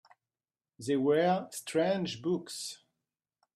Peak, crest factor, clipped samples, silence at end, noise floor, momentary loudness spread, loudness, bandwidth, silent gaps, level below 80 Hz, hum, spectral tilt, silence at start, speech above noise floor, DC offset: -14 dBFS; 18 dB; under 0.1%; 0.8 s; under -90 dBFS; 14 LU; -31 LUFS; 15.5 kHz; none; -78 dBFS; none; -5 dB/octave; 0.8 s; over 59 dB; under 0.1%